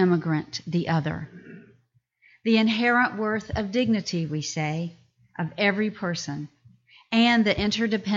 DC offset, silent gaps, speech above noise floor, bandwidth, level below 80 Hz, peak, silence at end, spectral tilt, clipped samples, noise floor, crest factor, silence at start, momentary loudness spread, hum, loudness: under 0.1%; none; 41 dB; 7.6 kHz; -52 dBFS; -8 dBFS; 0 s; -5.5 dB/octave; under 0.1%; -65 dBFS; 16 dB; 0 s; 14 LU; none; -25 LUFS